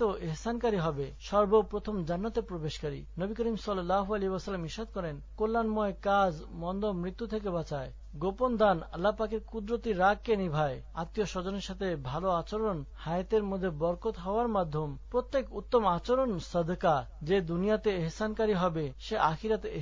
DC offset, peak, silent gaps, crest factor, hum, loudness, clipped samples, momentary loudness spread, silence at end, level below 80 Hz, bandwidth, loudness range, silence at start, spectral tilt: under 0.1%; -12 dBFS; none; 18 dB; none; -32 LUFS; under 0.1%; 9 LU; 0 s; -46 dBFS; 7.6 kHz; 3 LU; 0 s; -6.5 dB/octave